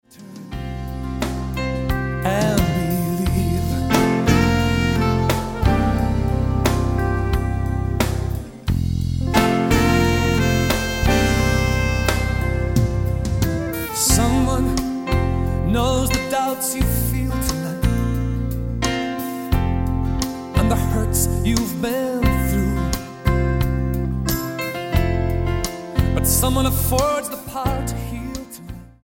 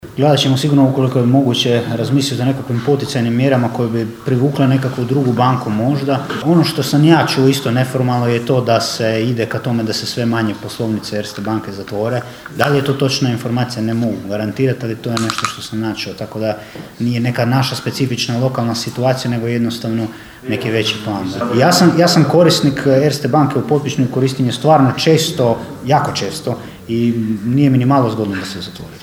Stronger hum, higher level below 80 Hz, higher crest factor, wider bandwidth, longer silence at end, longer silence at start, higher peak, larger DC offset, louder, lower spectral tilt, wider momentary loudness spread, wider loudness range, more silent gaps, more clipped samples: neither; first, -26 dBFS vs -50 dBFS; about the same, 18 dB vs 14 dB; about the same, 17 kHz vs 16.5 kHz; first, 0.15 s vs 0 s; first, 0.2 s vs 0.05 s; about the same, -2 dBFS vs 0 dBFS; neither; second, -20 LUFS vs -15 LUFS; about the same, -5.5 dB/octave vs -6 dB/octave; about the same, 8 LU vs 10 LU; second, 3 LU vs 6 LU; neither; neither